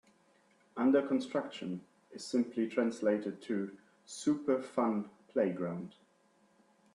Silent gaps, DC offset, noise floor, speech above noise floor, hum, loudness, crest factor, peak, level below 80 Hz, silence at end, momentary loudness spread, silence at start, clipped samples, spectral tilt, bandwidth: none; under 0.1%; -69 dBFS; 36 dB; none; -34 LUFS; 18 dB; -16 dBFS; -80 dBFS; 1.05 s; 15 LU; 0.75 s; under 0.1%; -6 dB/octave; 11 kHz